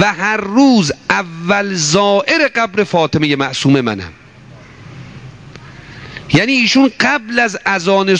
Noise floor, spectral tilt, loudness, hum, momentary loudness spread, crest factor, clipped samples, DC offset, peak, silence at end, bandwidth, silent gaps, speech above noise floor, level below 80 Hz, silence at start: -38 dBFS; -4.5 dB/octave; -13 LUFS; none; 20 LU; 14 dB; under 0.1%; 0.1%; 0 dBFS; 0 s; 9.8 kHz; none; 25 dB; -48 dBFS; 0 s